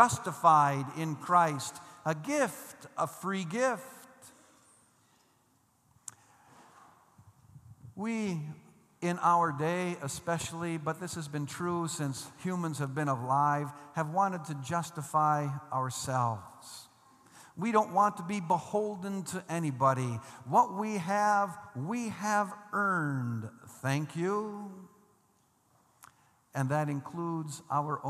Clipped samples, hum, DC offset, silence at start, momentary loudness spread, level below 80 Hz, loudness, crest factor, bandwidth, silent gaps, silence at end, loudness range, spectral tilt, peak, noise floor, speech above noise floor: under 0.1%; none; under 0.1%; 0 s; 14 LU; -72 dBFS; -32 LUFS; 26 dB; 14.5 kHz; none; 0 s; 8 LU; -5.5 dB/octave; -6 dBFS; -70 dBFS; 38 dB